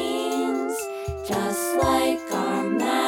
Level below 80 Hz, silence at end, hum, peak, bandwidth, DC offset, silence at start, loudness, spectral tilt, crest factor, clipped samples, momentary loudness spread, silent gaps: -46 dBFS; 0 s; none; -8 dBFS; 18 kHz; under 0.1%; 0 s; -25 LUFS; -4 dB/octave; 16 dB; under 0.1%; 8 LU; none